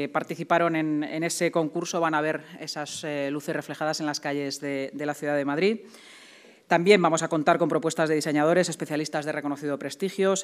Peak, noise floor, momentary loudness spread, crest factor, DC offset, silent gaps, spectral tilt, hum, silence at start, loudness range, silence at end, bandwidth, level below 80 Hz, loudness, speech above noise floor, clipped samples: -6 dBFS; -52 dBFS; 9 LU; 20 dB; under 0.1%; none; -4.5 dB/octave; none; 0 s; 6 LU; 0 s; 15.5 kHz; -80 dBFS; -26 LUFS; 26 dB; under 0.1%